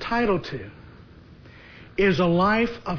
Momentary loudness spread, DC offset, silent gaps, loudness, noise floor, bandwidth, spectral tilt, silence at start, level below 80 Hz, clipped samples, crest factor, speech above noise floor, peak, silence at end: 16 LU; under 0.1%; none; -22 LUFS; -47 dBFS; 5.4 kHz; -7.5 dB/octave; 0 s; -44 dBFS; under 0.1%; 16 dB; 25 dB; -10 dBFS; 0 s